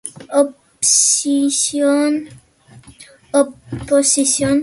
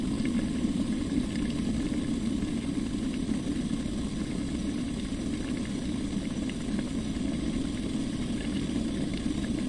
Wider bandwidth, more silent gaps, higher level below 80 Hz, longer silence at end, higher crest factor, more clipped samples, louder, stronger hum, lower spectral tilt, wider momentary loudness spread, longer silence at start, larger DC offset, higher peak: about the same, 11.5 kHz vs 11.5 kHz; neither; second, -50 dBFS vs -42 dBFS; about the same, 0 s vs 0 s; about the same, 16 dB vs 14 dB; neither; first, -15 LUFS vs -31 LUFS; neither; second, -2.5 dB/octave vs -6 dB/octave; first, 9 LU vs 3 LU; about the same, 0.05 s vs 0 s; neither; first, 0 dBFS vs -16 dBFS